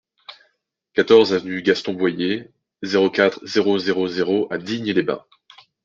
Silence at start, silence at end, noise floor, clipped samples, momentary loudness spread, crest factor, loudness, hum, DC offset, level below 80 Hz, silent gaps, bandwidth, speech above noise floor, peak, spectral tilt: 0.3 s; 0.65 s; -69 dBFS; under 0.1%; 11 LU; 18 dB; -20 LUFS; none; under 0.1%; -66 dBFS; none; 7.4 kHz; 50 dB; -2 dBFS; -5.5 dB/octave